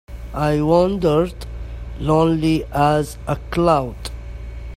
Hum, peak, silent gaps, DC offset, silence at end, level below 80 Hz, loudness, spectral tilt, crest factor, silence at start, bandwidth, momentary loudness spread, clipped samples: none; -2 dBFS; none; under 0.1%; 0 s; -32 dBFS; -19 LUFS; -7 dB/octave; 18 dB; 0.1 s; 15 kHz; 17 LU; under 0.1%